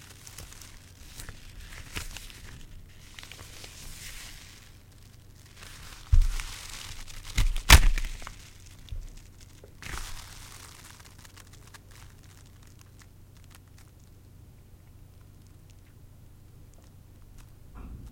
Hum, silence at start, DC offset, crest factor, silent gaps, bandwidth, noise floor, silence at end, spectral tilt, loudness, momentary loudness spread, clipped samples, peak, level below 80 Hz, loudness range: none; 0.25 s; under 0.1%; 28 dB; none; 17 kHz; -52 dBFS; 0 s; -2.5 dB/octave; -28 LUFS; 22 LU; under 0.1%; -4 dBFS; -34 dBFS; 26 LU